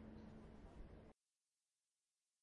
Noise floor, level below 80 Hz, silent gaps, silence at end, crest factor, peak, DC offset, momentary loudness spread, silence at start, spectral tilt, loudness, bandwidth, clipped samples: under -90 dBFS; -66 dBFS; none; 1.3 s; 16 dB; -46 dBFS; under 0.1%; 6 LU; 0 s; -7.5 dB/octave; -62 LUFS; 10 kHz; under 0.1%